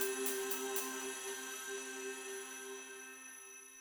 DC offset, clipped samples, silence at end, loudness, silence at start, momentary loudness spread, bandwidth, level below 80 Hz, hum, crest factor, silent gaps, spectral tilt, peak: under 0.1%; under 0.1%; 0 s; -42 LUFS; 0 s; 13 LU; over 20 kHz; -86 dBFS; none; 20 dB; none; 0.5 dB/octave; -22 dBFS